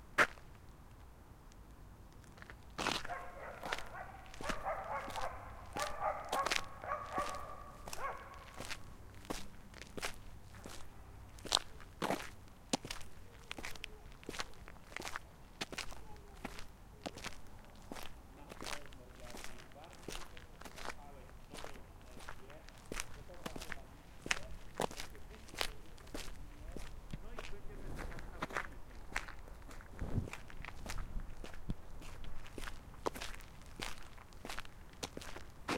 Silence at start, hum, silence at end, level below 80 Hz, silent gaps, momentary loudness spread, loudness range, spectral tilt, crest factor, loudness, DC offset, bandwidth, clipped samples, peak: 0 s; none; 0 s; -52 dBFS; none; 17 LU; 9 LU; -3 dB/octave; 36 dB; -45 LUFS; under 0.1%; 16.5 kHz; under 0.1%; -8 dBFS